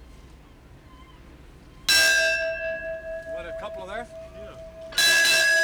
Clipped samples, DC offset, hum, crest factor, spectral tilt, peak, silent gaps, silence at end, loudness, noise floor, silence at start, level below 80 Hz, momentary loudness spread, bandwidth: under 0.1%; under 0.1%; none; 16 dB; 0.5 dB/octave; -10 dBFS; none; 0 s; -20 LUFS; -49 dBFS; 0 s; -50 dBFS; 24 LU; over 20 kHz